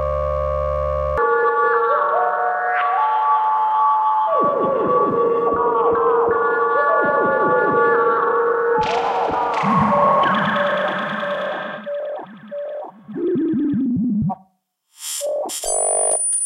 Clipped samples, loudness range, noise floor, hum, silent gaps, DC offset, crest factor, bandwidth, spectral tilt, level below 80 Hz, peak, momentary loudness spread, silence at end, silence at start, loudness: under 0.1%; 7 LU; -64 dBFS; none; none; under 0.1%; 14 dB; 14.5 kHz; -4 dB/octave; -40 dBFS; -6 dBFS; 11 LU; 0 s; 0 s; -18 LUFS